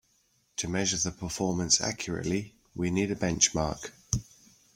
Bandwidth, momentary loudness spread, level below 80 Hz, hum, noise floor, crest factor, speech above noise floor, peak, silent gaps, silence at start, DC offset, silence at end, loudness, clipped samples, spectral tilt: 16.5 kHz; 10 LU; -50 dBFS; none; -69 dBFS; 24 dB; 40 dB; -6 dBFS; none; 0.6 s; under 0.1%; 0.55 s; -29 LUFS; under 0.1%; -3 dB/octave